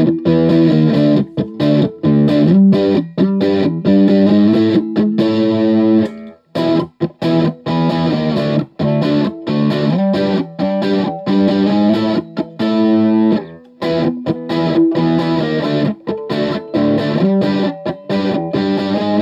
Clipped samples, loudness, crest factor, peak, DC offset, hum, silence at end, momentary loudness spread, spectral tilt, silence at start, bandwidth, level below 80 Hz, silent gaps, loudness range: under 0.1%; -15 LUFS; 12 dB; -2 dBFS; under 0.1%; none; 0 s; 8 LU; -8.5 dB/octave; 0 s; 7.4 kHz; -54 dBFS; none; 4 LU